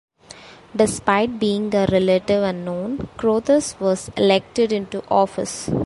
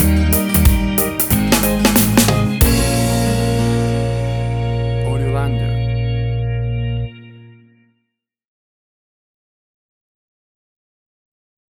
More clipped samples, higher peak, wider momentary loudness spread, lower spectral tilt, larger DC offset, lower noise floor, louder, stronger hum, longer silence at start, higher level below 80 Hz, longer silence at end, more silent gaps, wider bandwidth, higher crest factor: neither; about the same, -2 dBFS vs 0 dBFS; about the same, 8 LU vs 7 LU; about the same, -5 dB/octave vs -5 dB/octave; neither; second, -43 dBFS vs -75 dBFS; second, -20 LUFS vs -16 LUFS; neither; first, 0.35 s vs 0 s; second, -48 dBFS vs -26 dBFS; second, 0 s vs 4.2 s; neither; second, 11.5 kHz vs over 20 kHz; about the same, 18 dB vs 16 dB